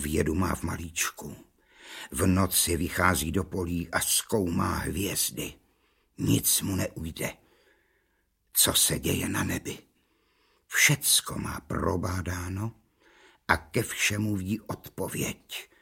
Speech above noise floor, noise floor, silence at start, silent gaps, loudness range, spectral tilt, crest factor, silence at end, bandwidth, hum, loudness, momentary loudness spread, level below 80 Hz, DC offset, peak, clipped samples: 44 dB; -72 dBFS; 0 s; none; 5 LU; -3 dB/octave; 24 dB; 0.15 s; 17 kHz; none; -27 LUFS; 14 LU; -48 dBFS; under 0.1%; -6 dBFS; under 0.1%